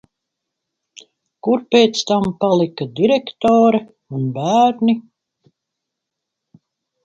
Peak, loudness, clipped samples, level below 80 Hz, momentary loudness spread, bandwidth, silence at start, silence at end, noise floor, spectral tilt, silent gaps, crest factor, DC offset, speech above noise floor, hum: 0 dBFS; -17 LUFS; under 0.1%; -58 dBFS; 10 LU; 7.8 kHz; 1.45 s; 2.05 s; -80 dBFS; -5.5 dB/octave; none; 18 dB; under 0.1%; 65 dB; none